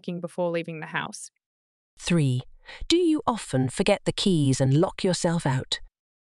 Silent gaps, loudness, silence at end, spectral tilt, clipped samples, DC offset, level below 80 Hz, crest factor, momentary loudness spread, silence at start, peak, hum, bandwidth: 1.46-1.97 s; -25 LUFS; 0.45 s; -5.5 dB/octave; under 0.1%; under 0.1%; -48 dBFS; 18 dB; 12 LU; 0.05 s; -6 dBFS; none; 12 kHz